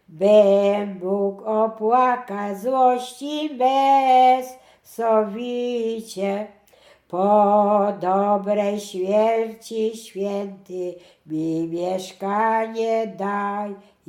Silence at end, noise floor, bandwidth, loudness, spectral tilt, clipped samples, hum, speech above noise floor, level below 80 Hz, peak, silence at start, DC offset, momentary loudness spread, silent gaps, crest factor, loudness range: 0.3 s; -54 dBFS; 15 kHz; -21 LUFS; -6 dB/octave; under 0.1%; none; 33 dB; -72 dBFS; -4 dBFS; 0.1 s; under 0.1%; 14 LU; none; 16 dB; 6 LU